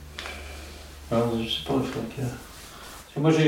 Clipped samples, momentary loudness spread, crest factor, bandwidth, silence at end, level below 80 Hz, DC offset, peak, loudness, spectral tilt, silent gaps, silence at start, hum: under 0.1%; 16 LU; 20 dB; 17 kHz; 0 s; -46 dBFS; under 0.1%; -8 dBFS; -28 LUFS; -6 dB/octave; none; 0 s; none